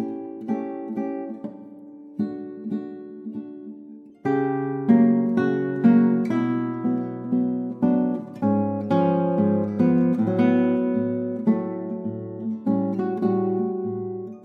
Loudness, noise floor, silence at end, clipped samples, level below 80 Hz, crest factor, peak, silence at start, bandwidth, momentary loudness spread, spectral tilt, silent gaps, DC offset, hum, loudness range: -23 LUFS; -43 dBFS; 0 s; under 0.1%; -74 dBFS; 18 dB; -6 dBFS; 0 s; 4.7 kHz; 16 LU; -10.5 dB/octave; none; under 0.1%; none; 10 LU